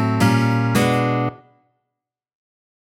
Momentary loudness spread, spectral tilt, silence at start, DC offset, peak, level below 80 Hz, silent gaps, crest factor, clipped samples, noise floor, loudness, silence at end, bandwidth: 6 LU; -6.5 dB/octave; 0 s; under 0.1%; -4 dBFS; -54 dBFS; none; 16 dB; under 0.1%; -83 dBFS; -18 LUFS; 1.55 s; 17 kHz